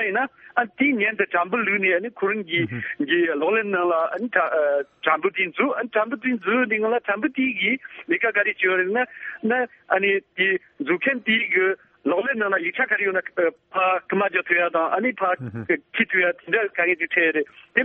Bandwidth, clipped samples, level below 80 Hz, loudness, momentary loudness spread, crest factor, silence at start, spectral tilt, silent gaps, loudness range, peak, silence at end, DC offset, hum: 4 kHz; under 0.1%; -70 dBFS; -22 LUFS; 5 LU; 20 dB; 0 s; -2.5 dB/octave; none; 1 LU; -4 dBFS; 0 s; under 0.1%; none